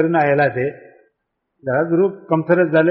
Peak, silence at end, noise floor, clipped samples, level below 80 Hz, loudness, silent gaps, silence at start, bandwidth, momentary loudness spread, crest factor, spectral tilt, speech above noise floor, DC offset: -4 dBFS; 0 s; -74 dBFS; under 0.1%; -60 dBFS; -17 LUFS; none; 0 s; 5.4 kHz; 9 LU; 14 dB; -6.5 dB/octave; 58 dB; under 0.1%